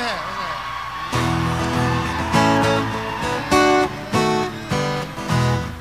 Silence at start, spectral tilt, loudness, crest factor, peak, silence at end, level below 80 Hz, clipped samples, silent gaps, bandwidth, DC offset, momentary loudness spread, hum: 0 s; -5 dB/octave; -20 LUFS; 16 dB; -4 dBFS; 0 s; -38 dBFS; under 0.1%; none; 15.5 kHz; 0.3%; 10 LU; none